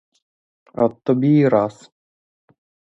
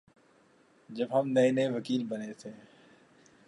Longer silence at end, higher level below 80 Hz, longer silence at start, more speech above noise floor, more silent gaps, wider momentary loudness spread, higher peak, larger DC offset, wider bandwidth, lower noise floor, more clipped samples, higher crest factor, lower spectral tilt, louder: first, 1.25 s vs 0.9 s; first, -62 dBFS vs -82 dBFS; about the same, 0.8 s vs 0.9 s; first, over 73 dB vs 34 dB; neither; second, 10 LU vs 20 LU; first, -4 dBFS vs -14 dBFS; neither; second, 8 kHz vs 11.5 kHz; first, under -90 dBFS vs -64 dBFS; neither; about the same, 18 dB vs 18 dB; first, -9.5 dB/octave vs -6.5 dB/octave; first, -18 LUFS vs -30 LUFS